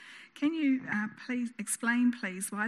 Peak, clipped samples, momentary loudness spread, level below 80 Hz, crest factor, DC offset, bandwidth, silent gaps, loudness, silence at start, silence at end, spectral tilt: -18 dBFS; under 0.1%; 7 LU; -86 dBFS; 14 dB; under 0.1%; 13.5 kHz; none; -31 LUFS; 0 s; 0 s; -3.5 dB/octave